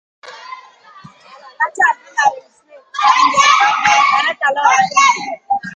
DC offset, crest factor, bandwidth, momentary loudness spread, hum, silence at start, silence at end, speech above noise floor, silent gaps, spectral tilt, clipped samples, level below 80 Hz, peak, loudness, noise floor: under 0.1%; 16 dB; 9.4 kHz; 11 LU; none; 0.25 s; 0 s; 27 dB; none; 0 dB/octave; under 0.1%; -64 dBFS; 0 dBFS; -13 LUFS; -41 dBFS